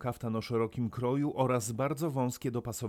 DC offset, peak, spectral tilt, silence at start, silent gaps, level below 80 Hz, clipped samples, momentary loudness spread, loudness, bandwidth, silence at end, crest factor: under 0.1%; -16 dBFS; -6.5 dB/octave; 0 s; none; -62 dBFS; under 0.1%; 5 LU; -33 LUFS; 17.5 kHz; 0 s; 16 dB